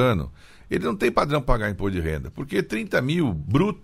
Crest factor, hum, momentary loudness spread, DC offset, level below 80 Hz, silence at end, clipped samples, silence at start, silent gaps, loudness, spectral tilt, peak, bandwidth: 18 dB; none; 7 LU; under 0.1%; -34 dBFS; 0 s; under 0.1%; 0 s; none; -24 LUFS; -7 dB/octave; -6 dBFS; 16 kHz